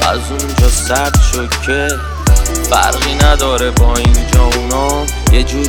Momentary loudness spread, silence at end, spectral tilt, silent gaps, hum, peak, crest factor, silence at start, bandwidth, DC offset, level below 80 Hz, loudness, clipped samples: 4 LU; 0 s; -4 dB/octave; none; none; 0 dBFS; 10 dB; 0 s; 18.5 kHz; under 0.1%; -14 dBFS; -12 LUFS; under 0.1%